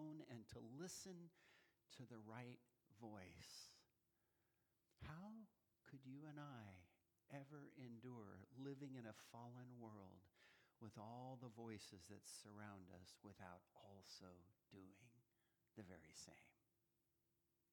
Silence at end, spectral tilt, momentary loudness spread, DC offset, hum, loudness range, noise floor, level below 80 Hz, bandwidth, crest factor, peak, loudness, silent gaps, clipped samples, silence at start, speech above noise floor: 1.2 s; -5 dB/octave; 9 LU; under 0.1%; none; 6 LU; -89 dBFS; -86 dBFS; 19 kHz; 20 dB; -42 dBFS; -61 LUFS; none; under 0.1%; 0 s; 29 dB